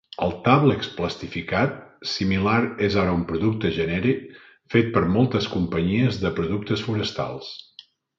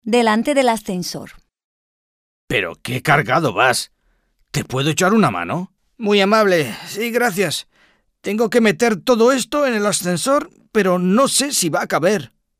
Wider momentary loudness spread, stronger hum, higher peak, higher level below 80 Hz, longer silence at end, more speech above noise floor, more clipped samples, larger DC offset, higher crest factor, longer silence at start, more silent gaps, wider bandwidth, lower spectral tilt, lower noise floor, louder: about the same, 9 LU vs 11 LU; neither; about the same, -4 dBFS vs -2 dBFS; first, -44 dBFS vs -54 dBFS; first, 0.55 s vs 0.35 s; second, 28 dB vs 45 dB; neither; neither; about the same, 20 dB vs 16 dB; first, 0.2 s vs 0.05 s; second, none vs 1.64-2.48 s; second, 7.6 kHz vs 16 kHz; first, -7 dB/octave vs -4 dB/octave; second, -51 dBFS vs -62 dBFS; second, -23 LUFS vs -17 LUFS